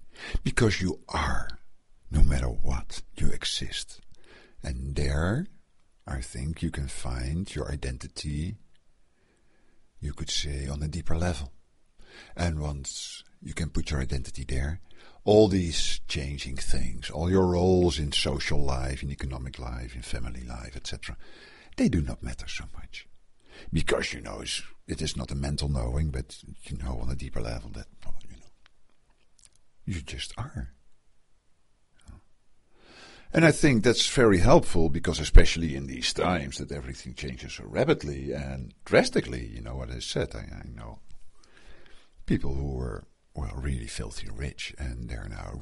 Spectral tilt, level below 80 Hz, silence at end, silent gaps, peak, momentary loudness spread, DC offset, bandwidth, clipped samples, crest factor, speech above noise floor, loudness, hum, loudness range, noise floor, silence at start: -5 dB/octave; -34 dBFS; 0 s; none; -4 dBFS; 19 LU; under 0.1%; 11.5 kHz; under 0.1%; 24 dB; 36 dB; -29 LUFS; none; 14 LU; -62 dBFS; 0 s